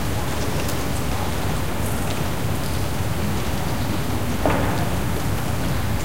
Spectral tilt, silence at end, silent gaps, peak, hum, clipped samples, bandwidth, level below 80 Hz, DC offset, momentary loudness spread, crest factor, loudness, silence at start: -5 dB/octave; 0 s; none; -4 dBFS; none; under 0.1%; 16 kHz; -32 dBFS; 5%; 3 LU; 18 dB; -24 LUFS; 0 s